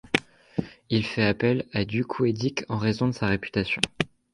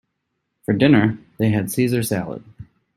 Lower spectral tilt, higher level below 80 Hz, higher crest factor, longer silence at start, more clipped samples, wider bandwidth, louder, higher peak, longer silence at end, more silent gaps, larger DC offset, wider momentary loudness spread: about the same, -5.5 dB/octave vs -6.5 dB/octave; about the same, -52 dBFS vs -54 dBFS; first, 24 dB vs 18 dB; second, 0.15 s vs 0.7 s; neither; second, 11.5 kHz vs 16 kHz; second, -26 LUFS vs -19 LUFS; about the same, -2 dBFS vs -2 dBFS; about the same, 0.25 s vs 0.35 s; neither; neither; second, 8 LU vs 17 LU